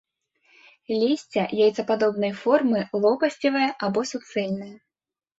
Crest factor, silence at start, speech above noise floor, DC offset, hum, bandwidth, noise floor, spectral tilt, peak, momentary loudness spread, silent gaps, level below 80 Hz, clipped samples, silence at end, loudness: 18 dB; 0.9 s; over 67 dB; under 0.1%; none; 8 kHz; under -90 dBFS; -5.5 dB/octave; -6 dBFS; 8 LU; none; -68 dBFS; under 0.1%; 0.65 s; -24 LUFS